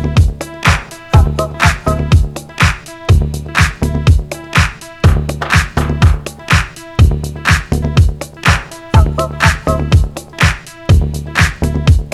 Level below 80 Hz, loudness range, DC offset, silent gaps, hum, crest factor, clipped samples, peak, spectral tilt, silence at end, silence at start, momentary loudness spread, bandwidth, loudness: -18 dBFS; 1 LU; under 0.1%; none; none; 12 dB; under 0.1%; 0 dBFS; -5.5 dB/octave; 0 s; 0 s; 4 LU; 13.5 kHz; -13 LUFS